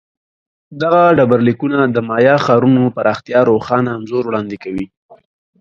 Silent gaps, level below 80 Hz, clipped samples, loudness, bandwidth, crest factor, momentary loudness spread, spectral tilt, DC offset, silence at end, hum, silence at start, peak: 4.97-5.09 s; -52 dBFS; under 0.1%; -14 LUFS; 7.2 kHz; 14 dB; 12 LU; -8 dB/octave; under 0.1%; 0.45 s; none; 0.7 s; 0 dBFS